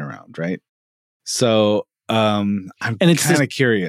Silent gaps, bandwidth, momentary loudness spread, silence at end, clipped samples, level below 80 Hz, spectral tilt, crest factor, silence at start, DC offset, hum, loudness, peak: 0.69-1.20 s; 16 kHz; 12 LU; 0 s; under 0.1%; -70 dBFS; -4.5 dB/octave; 14 dB; 0 s; under 0.1%; none; -18 LUFS; -4 dBFS